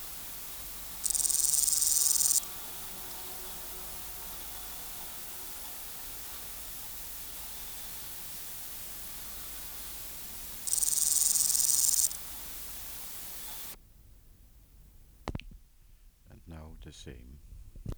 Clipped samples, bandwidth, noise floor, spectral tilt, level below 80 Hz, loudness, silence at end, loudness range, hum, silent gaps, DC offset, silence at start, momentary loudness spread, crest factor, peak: under 0.1%; over 20 kHz; -57 dBFS; 0 dB/octave; -54 dBFS; -30 LUFS; 0 s; 19 LU; none; none; under 0.1%; 0 s; 19 LU; 26 dB; -10 dBFS